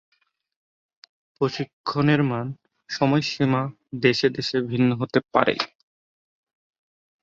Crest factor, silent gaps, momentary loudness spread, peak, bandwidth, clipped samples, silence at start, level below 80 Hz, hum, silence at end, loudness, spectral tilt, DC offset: 22 dB; 1.73-1.84 s; 10 LU; -2 dBFS; 7.8 kHz; under 0.1%; 1.4 s; -62 dBFS; none; 1.55 s; -23 LUFS; -6.5 dB/octave; under 0.1%